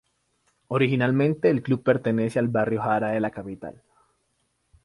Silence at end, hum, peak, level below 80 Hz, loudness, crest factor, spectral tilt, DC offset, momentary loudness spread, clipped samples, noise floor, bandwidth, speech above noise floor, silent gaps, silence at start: 1.15 s; none; -8 dBFS; -62 dBFS; -24 LUFS; 18 dB; -8 dB/octave; under 0.1%; 13 LU; under 0.1%; -72 dBFS; 11.5 kHz; 49 dB; none; 0.7 s